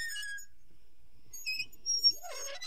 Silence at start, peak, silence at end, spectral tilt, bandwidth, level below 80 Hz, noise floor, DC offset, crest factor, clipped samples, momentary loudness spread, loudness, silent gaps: 0 s; -16 dBFS; 0 s; 2 dB/octave; 16 kHz; -66 dBFS; -64 dBFS; 0.7%; 20 dB; under 0.1%; 17 LU; -32 LUFS; none